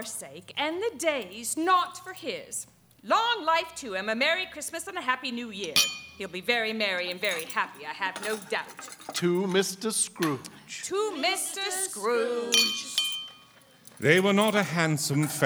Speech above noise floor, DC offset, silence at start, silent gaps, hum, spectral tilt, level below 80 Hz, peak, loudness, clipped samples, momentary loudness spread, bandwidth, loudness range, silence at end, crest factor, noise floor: 28 dB; under 0.1%; 0 s; none; none; -3 dB/octave; -72 dBFS; -4 dBFS; -27 LUFS; under 0.1%; 13 LU; over 20 kHz; 4 LU; 0 s; 26 dB; -56 dBFS